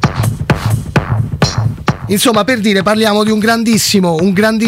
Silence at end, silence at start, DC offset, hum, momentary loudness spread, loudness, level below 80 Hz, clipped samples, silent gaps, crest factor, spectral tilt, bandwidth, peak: 0 s; 0 s; under 0.1%; none; 5 LU; -12 LUFS; -32 dBFS; under 0.1%; none; 12 dB; -5 dB/octave; 16.5 kHz; 0 dBFS